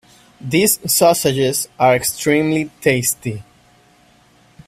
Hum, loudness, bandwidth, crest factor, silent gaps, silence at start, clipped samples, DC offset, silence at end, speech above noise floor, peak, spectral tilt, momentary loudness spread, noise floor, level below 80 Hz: none; -16 LUFS; 16 kHz; 18 dB; none; 0.4 s; under 0.1%; under 0.1%; 1.25 s; 36 dB; 0 dBFS; -3.5 dB/octave; 10 LU; -52 dBFS; -52 dBFS